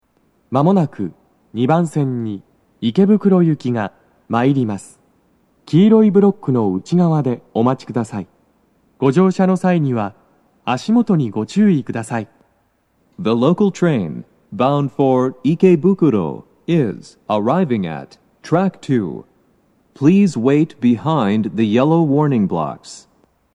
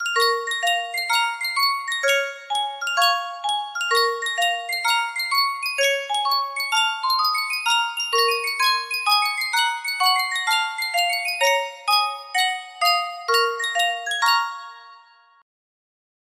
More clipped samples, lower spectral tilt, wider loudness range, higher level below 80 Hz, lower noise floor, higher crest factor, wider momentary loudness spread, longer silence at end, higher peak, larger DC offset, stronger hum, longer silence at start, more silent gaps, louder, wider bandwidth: neither; first, -8 dB/octave vs 3.5 dB/octave; about the same, 3 LU vs 2 LU; first, -62 dBFS vs -76 dBFS; first, -61 dBFS vs -51 dBFS; about the same, 16 dB vs 16 dB; first, 14 LU vs 4 LU; second, 0.55 s vs 1.4 s; first, 0 dBFS vs -6 dBFS; neither; neither; first, 0.5 s vs 0 s; neither; first, -16 LUFS vs -21 LUFS; second, 10.5 kHz vs 16 kHz